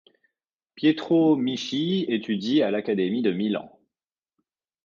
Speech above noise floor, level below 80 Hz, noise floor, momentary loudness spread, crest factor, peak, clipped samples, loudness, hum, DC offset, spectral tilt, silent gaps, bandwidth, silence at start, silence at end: over 67 dB; -72 dBFS; under -90 dBFS; 6 LU; 16 dB; -8 dBFS; under 0.1%; -24 LUFS; none; under 0.1%; -6.5 dB/octave; none; 7.2 kHz; 0.75 s; 1.2 s